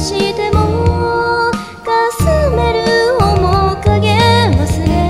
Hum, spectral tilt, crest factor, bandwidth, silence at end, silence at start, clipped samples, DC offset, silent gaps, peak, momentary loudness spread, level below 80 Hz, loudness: none; -6 dB/octave; 12 dB; 14.5 kHz; 0 s; 0 s; under 0.1%; 0.6%; none; 0 dBFS; 5 LU; -22 dBFS; -13 LUFS